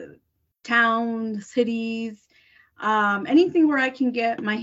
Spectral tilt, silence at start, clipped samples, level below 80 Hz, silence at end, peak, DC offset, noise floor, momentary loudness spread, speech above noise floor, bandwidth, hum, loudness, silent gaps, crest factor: -5.5 dB/octave; 0 s; under 0.1%; -70 dBFS; 0 s; -8 dBFS; under 0.1%; -64 dBFS; 10 LU; 42 dB; 8 kHz; none; -22 LUFS; none; 16 dB